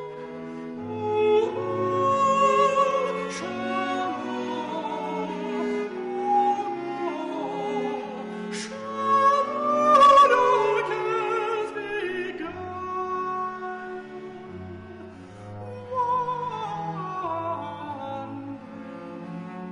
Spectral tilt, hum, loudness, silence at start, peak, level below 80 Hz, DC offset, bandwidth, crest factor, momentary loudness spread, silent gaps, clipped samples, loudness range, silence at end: -5 dB/octave; none; -25 LUFS; 0 s; -8 dBFS; -64 dBFS; under 0.1%; 10.5 kHz; 16 dB; 19 LU; none; under 0.1%; 12 LU; 0 s